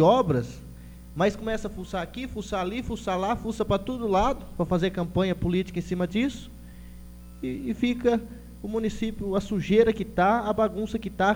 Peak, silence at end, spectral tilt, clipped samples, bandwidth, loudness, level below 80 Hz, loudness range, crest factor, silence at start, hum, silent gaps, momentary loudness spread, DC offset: -8 dBFS; 0 s; -6.5 dB/octave; under 0.1%; over 20 kHz; -27 LUFS; -42 dBFS; 4 LU; 18 dB; 0 s; 60 Hz at -45 dBFS; none; 19 LU; under 0.1%